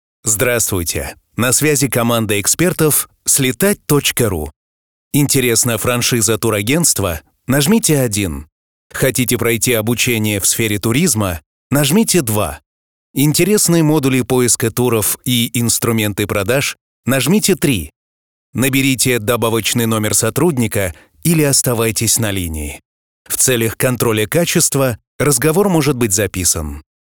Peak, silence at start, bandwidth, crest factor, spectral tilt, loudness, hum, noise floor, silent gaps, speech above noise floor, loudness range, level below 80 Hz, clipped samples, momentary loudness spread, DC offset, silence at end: -2 dBFS; 0.25 s; over 20 kHz; 12 dB; -4 dB/octave; -14 LUFS; none; under -90 dBFS; 4.56-5.11 s, 8.52-8.90 s, 11.46-11.70 s, 12.66-13.14 s, 16.81-17.03 s, 17.96-18.53 s, 22.85-23.25 s, 25.07-25.19 s; over 75 dB; 2 LU; -40 dBFS; under 0.1%; 9 LU; 0.3%; 0.3 s